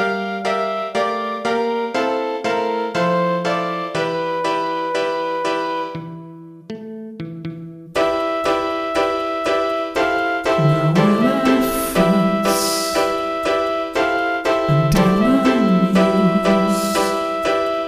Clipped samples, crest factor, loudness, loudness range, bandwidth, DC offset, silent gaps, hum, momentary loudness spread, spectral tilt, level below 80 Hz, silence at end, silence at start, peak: under 0.1%; 14 dB; -18 LUFS; 8 LU; 16 kHz; under 0.1%; none; none; 12 LU; -5.5 dB/octave; -44 dBFS; 0 s; 0 s; -4 dBFS